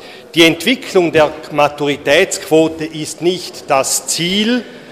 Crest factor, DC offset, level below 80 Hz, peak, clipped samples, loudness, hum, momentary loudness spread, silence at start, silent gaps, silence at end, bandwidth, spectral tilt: 14 dB; under 0.1%; -50 dBFS; 0 dBFS; under 0.1%; -14 LUFS; none; 8 LU; 0 s; none; 0 s; 16.5 kHz; -3 dB/octave